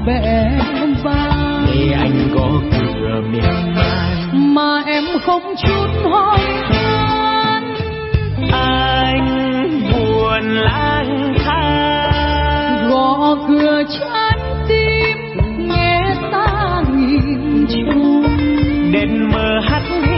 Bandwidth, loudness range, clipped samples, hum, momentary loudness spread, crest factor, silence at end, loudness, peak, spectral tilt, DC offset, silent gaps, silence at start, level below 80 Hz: 5.8 kHz; 1 LU; under 0.1%; none; 4 LU; 12 dB; 0 s; -15 LUFS; -2 dBFS; -11 dB/octave; under 0.1%; none; 0 s; -26 dBFS